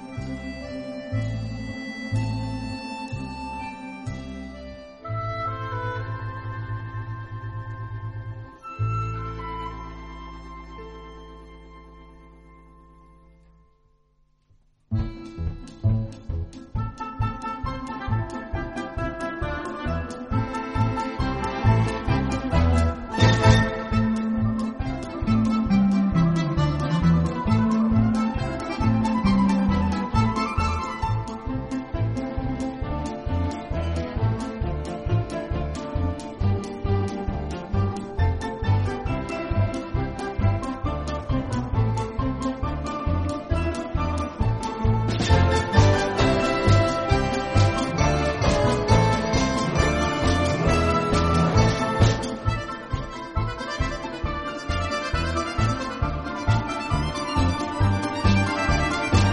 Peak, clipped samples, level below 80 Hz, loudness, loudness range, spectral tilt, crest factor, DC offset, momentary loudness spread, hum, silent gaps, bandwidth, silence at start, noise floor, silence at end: -2 dBFS; under 0.1%; -34 dBFS; -25 LUFS; 11 LU; -6.5 dB/octave; 22 dB; under 0.1%; 13 LU; none; none; 11.5 kHz; 0 s; -63 dBFS; 0 s